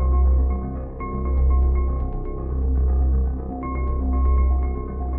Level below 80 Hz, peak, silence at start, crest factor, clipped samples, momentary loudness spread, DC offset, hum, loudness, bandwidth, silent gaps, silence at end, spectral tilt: -20 dBFS; -10 dBFS; 0 s; 10 dB; under 0.1%; 9 LU; under 0.1%; none; -23 LUFS; 2.3 kHz; none; 0 s; -12.5 dB/octave